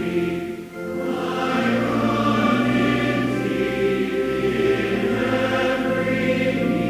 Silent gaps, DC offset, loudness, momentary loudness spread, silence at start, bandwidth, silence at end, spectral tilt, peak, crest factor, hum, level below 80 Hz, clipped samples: none; under 0.1%; -21 LUFS; 6 LU; 0 s; 16 kHz; 0 s; -6.5 dB/octave; -8 dBFS; 14 dB; none; -46 dBFS; under 0.1%